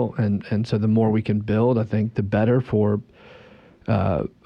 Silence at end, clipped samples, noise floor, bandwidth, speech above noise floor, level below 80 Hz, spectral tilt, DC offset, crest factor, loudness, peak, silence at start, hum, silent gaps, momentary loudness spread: 0.2 s; under 0.1%; -49 dBFS; 6.6 kHz; 28 dB; -50 dBFS; -9.5 dB/octave; under 0.1%; 12 dB; -22 LUFS; -8 dBFS; 0 s; none; none; 5 LU